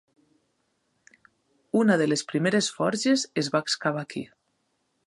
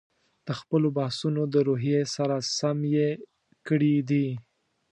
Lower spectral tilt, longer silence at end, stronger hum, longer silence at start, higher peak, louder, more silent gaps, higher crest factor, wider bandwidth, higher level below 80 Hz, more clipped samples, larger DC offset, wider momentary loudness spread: second, -4.5 dB/octave vs -6 dB/octave; first, 0.8 s vs 0.5 s; neither; first, 1.75 s vs 0.45 s; first, -8 dBFS vs -12 dBFS; about the same, -25 LUFS vs -26 LUFS; neither; about the same, 20 dB vs 16 dB; about the same, 11.5 kHz vs 10.5 kHz; about the same, -74 dBFS vs -72 dBFS; neither; neither; about the same, 12 LU vs 12 LU